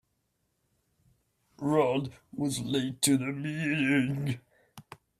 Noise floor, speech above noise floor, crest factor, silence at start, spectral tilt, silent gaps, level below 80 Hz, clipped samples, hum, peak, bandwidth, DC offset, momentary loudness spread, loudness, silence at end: -77 dBFS; 48 dB; 20 dB; 1.6 s; -4.5 dB/octave; none; -66 dBFS; under 0.1%; none; -12 dBFS; 15.5 kHz; under 0.1%; 9 LU; -29 LUFS; 0.4 s